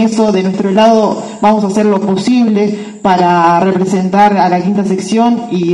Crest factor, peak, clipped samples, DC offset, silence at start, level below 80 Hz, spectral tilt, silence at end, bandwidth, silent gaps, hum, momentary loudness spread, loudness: 10 dB; 0 dBFS; 0.3%; under 0.1%; 0 s; -52 dBFS; -6.5 dB/octave; 0 s; 11 kHz; none; none; 5 LU; -11 LUFS